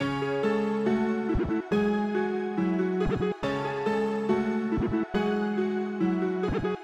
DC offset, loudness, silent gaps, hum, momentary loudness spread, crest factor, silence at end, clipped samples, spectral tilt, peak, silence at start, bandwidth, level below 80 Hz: under 0.1%; -28 LUFS; none; none; 2 LU; 14 dB; 0 s; under 0.1%; -7.5 dB/octave; -14 dBFS; 0 s; 8.4 kHz; -46 dBFS